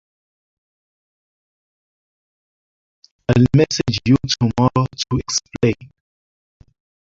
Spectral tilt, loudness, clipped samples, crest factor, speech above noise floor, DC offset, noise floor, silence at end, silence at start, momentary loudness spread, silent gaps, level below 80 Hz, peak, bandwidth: -5.5 dB/octave; -17 LUFS; under 0.1%; 20 dB; over 73 dB; under 0.1%; under -90 dBFS; 1.35 s; 3.3 s; 8 LU; none; -44 dBFS; -2 dBFS; 7.8 kHz